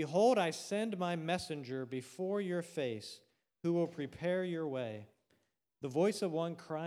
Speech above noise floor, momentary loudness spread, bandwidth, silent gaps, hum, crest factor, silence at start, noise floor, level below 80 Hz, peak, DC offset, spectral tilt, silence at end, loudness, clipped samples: 43 dB; 11 LU; 15.5 kHz; none; none; 18 dB; 0 s; -79 dBFS; -76 dBFS; -18 dBFS; under 0.1%; -5.5 dB/octave; 0 s; -37 LUFS; under 0.1%